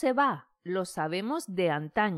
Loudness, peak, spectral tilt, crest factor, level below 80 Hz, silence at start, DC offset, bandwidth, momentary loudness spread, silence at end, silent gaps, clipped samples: -30 LUFS; -14 dBFS; -5.5 dB/octave; 16 dB; -68 dBFS; 0 s; under 0.1%; 15.5 kHz; 7 LU; 0 s; none; under 0.1%